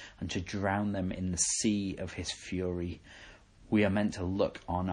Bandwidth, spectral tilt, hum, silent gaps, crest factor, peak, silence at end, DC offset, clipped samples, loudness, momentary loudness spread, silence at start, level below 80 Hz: 11 kHz; -4.5 dB/octave; none; none; 18 dB; -16 dBFS; 0 s; under 0.1%; under 0.1%; -32 LUFS; 10 LU; 0 s; -56 dBFS